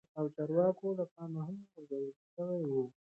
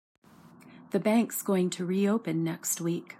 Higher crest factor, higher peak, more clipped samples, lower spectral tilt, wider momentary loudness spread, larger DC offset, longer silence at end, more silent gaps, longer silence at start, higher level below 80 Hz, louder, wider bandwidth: about the same, 18 dB vs 16 dB; second, -18 dBFS vs -14 dBFS; neither; first, -11 dB/octave vs -5.5 dB/octave; first, 13 LU vs 5 LU; neither; first, 0.25 s vs 0.05 s; first, 1.11-1.16 s, 2.16-2.37 s vs none; second, 0.15 s vs 0.65 s; about the same, -82 dBFS vs -78 dBFS; second, -37 LUFS vs -29 LUFS; second, 4 kHz vs 16 kHz